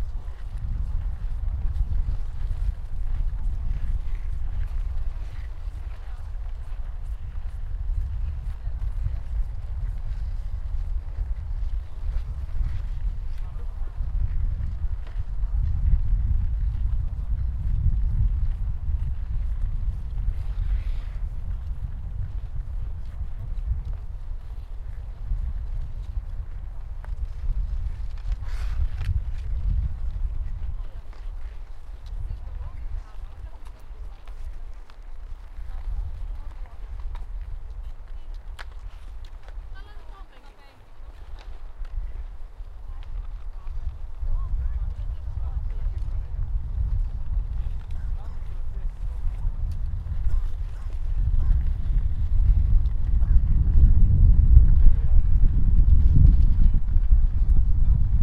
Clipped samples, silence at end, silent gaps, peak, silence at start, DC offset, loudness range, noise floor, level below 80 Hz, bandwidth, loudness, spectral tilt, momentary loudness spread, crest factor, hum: under 0.1%; 0 s; none; 0 dBFS; 0 s; under 0.1%; 19 LU; -45 dBFS; -24 dBFS; 3.3 kHz; -29 LUFS; -9 dB/octave; 19 LU; 22 dB; none